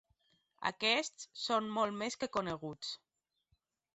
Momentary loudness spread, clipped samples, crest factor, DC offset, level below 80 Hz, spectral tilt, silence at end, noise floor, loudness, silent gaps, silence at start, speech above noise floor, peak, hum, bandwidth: 12 LU; under 0.1%; 22 dB; under 0.1%; -74 dBFS; -1.5 dB/octave; 1 s; -80 dBFS; -36 LUFS; none; 0.6 s; 43 dB; -16 dBFS; none; 8 kHz